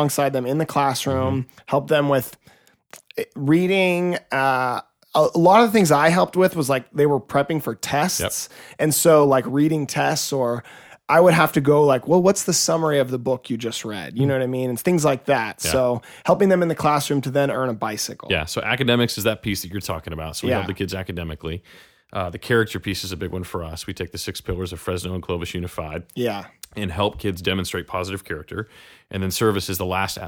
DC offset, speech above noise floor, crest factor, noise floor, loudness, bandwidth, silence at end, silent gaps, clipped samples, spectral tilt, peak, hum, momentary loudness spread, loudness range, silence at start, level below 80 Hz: under 0.1%; 28 dB; 20 dB; -48 dBFS; -21 LUFS; over 20 kHz; 0 s; none; under 0.1%; -4.5 dB/octave; -2 dBFS; none; 14 LU; 9 LU; 0 s; -48 dBFS